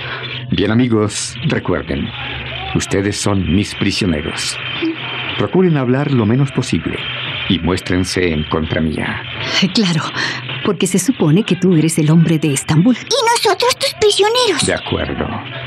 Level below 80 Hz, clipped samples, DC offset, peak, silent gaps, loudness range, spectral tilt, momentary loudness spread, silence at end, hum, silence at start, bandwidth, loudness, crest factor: -40 dBFS; under 0.1%; under 0.1%; -2 dBFS; none; 5 LU; -5 dB/octave; 8 LU; 0 s; none; 0 s; 14.5 kHz; -16 LUFS; 12 dB